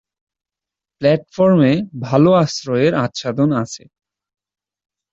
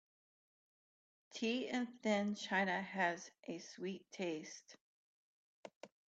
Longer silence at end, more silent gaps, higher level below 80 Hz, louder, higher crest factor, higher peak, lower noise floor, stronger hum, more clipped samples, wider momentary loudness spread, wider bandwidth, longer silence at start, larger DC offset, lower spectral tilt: first, 1.35 s vs 0.2 s; second, none vs 4.81-5.63 s, 5.76-5.81 s; first, -56 dBFS vs -86 dBFS; first, -16 LUFS vs -41 LUFS; about the same, 16 dB vs 20 dB; first, -2 dBFS vs -22 dBFS; about the same, -87 dBFS vs under -90 dBFS; neither; neither; second, 9 LU vs 19 LU; about the same, 8 kHz vs 8 kHz; second, 1 s vs 1.3 s; neither; first, -6.5 dB/octave vs -4.5 dB/octave